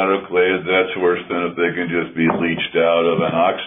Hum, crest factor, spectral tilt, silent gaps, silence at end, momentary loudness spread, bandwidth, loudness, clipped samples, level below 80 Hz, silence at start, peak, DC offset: none; 14 dB; -9.5 dB/octave; none; 0 s; 5 LU; 3.8 kHz; -18 LUFS; under 0.1%; -56 dBFS; 0 s; -4 dBFS; under 0.1%